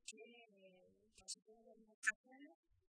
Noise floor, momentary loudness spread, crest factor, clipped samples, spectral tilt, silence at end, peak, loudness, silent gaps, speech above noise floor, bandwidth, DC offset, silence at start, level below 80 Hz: -72 dBFS; 25 LU; 28 dB; under 0.1%; 0.5 dB/octave; 0.35 s; -24 dBFS; -47 LUFS; 1.94-2.02 s, 2.15-2.24 s; 21 dB; 10.5 kHz; under 0.1%; 0.05 s; -88 dBFS